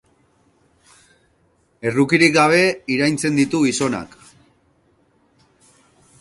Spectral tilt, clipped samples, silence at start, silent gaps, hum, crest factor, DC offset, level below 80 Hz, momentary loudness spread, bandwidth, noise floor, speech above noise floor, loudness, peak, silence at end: -4.5 dB/octave; under 0.1%; 1.85 s; none; none; 20 dB; under 0.1%; -58 dBFS; 12 LU; 11.5 kHz; -61 dBFS; 44 dB; -17 LUFS; 0 dBFS; 2.15 s